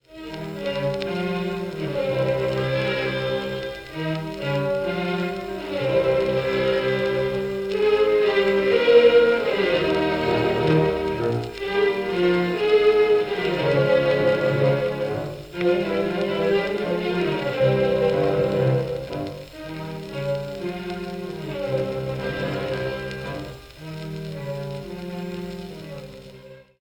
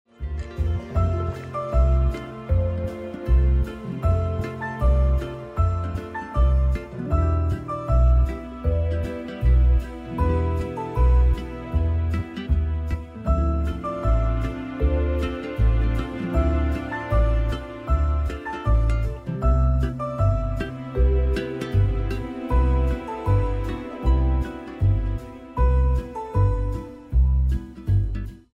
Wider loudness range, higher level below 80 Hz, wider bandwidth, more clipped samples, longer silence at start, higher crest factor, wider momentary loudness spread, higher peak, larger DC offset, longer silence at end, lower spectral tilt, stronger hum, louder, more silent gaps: first, 10 LU vs 1 LU; second, -48 dBFS vs -24 dBFS; first, 18.5 kHz vs 5.6 kHz; neither; about the same, 0.1 s vs 0.2 s; first, 18 dB vs 12 dB; first, 14 LU vs 9 LU; first, -4 dBFS vs -10 dBFS; neither; about the same, 0.2 s vs 0.2 s; second, -7 dB/octave vs -9 dB/octave; neither; about the same, -23 LUFS vs -24 LUFS; neither